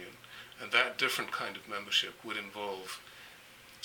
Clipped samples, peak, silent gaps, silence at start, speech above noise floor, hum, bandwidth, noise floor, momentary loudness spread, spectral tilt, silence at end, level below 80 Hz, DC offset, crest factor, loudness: under 0.1%; -10 dBFS; none; 0 s; 20 dB; none; 19 kHz; -55 dBFS; 22 LU; -1 dB/octave; 0 s; -74 dBFS; under 0.1%; 26 dB; -33 LUFS